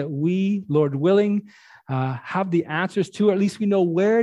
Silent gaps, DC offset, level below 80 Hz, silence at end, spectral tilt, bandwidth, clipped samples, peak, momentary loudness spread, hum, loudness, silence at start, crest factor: none; under 0.1%; -68 dBFS; 0 s; -7.5 dB/octave; 11 kHz; under 0.1%; -6 dBFS; 7 LU; none; -22 LUFS; 0 s; 14 dB